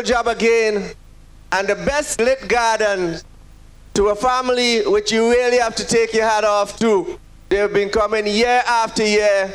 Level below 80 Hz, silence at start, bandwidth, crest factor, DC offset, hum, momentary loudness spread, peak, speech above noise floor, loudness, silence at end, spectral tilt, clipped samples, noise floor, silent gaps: -42 dBFS; 0 s; 13.5 kHz; 12 dB; under 0.1%; none; 7 LU; -6 dBFS; 25 dB; -17 LUFS; 0 s; -3 dB/octave; under 0.1%; -42 dBFS; none